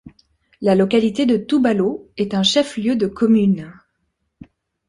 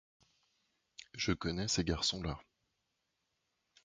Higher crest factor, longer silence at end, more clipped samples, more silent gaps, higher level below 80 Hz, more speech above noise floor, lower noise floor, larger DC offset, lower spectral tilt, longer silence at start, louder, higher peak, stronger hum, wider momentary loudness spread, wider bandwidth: second, 16 dB vs 22 dB; second, 1.15 s vs 1.4 s; neither; neither; about the same, -56 dBFS vs -54 dBFS; first, 54 dB vs 48 dB; second, -71 dBFS vs -84 dBFS; neither; first, -5.5 dB/octave vs -3.5 dB/octave; second, 0.05 s vs 1 s; first, -18 LUFS vs -36 LUFS; first, -2 dBFS vs -18 dBFS; neither; second, 8 LU vs 18 LU; first, 11.5 kHz vs 9.4 kHz